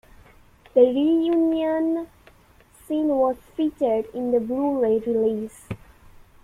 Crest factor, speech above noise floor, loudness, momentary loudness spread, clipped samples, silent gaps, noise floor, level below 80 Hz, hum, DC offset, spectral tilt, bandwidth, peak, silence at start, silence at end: 18 dB; 33 dB; -22 LUFS; 13 LU; under 0.1%; none; -54 dBFS; -56 dBFS; none; under 0.1%; -7 dB/octave; 13 kHz; -4 dBFS; 0.75 s; 0.7 s